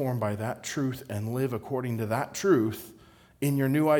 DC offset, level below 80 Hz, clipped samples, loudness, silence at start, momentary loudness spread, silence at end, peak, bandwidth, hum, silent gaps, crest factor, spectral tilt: under 0.1%; -66 dBFS; under 0.1%; -29 LUFS; 0 s; 8 LU; 0 s; -10 dBFS; over 20 kHz; none; none; 18 dB; -6.5 dB/octave